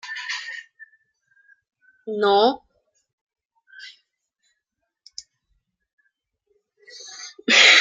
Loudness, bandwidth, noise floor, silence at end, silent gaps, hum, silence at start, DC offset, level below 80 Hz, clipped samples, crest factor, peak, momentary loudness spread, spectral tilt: -18 LUFS; 9.6 kHz; -80 dBFS; 0 s; 3.13-3.27 s, 3.45-3.50 s, 5.93-5.98 s; none; 0.05 s; under 0.1%; -72 dBFS; under 0.1%; 24 dB; 0 dBFS; 27 LU; -0.5 dB/octave